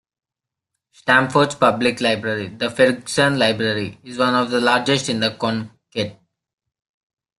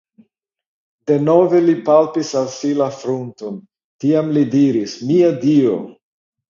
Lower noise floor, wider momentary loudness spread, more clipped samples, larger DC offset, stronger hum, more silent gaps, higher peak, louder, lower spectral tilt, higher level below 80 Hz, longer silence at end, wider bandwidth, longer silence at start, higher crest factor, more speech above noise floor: first, -86 dBFS vs -63 dBFS; second, 10 LU vs 15 LU; neither; neither; neither; second, none vs 3.84-3.99 s; about the same, 0 dBFS vs 0 dBFS; second, -19 LUFS vs -16 LUFS; second, -4.5 dB/octave vs -7 dB/octave; first, -58 dBFS vs -64 dBFS; first, 1.25 s vs 0.55 s; first, 12.5 kHz vs 7.4 kHz; about the same, 1.05 s vs 1.05 s; about the same, 20 dB vs 16 dB; first, 67 dB vs 47 dB